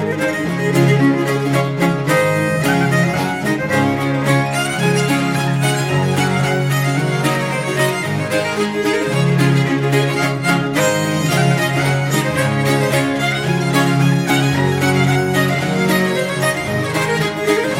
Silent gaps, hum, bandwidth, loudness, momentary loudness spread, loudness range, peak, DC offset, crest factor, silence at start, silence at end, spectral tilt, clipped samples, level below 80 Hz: none; none; 16.5 kHz; -16 LUFS; 4 LU; 1 LU; -2 dBFS; under 0.1%; 14 dB; 0 s; 0 s; -5.5 dB/octave; under 0.1%; -50 dBFS